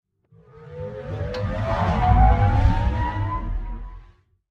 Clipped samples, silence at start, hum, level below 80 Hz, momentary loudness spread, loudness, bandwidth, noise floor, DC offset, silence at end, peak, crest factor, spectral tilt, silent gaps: under 0.1%; 0.6 s; none; -26 dBFS; 19 LU; -22 LUFS; 6.6 kHz; -54 dBFS; under 0.1%; 0.5 s; -4 dBFS; 18 dB; -8.5 dB/octave; none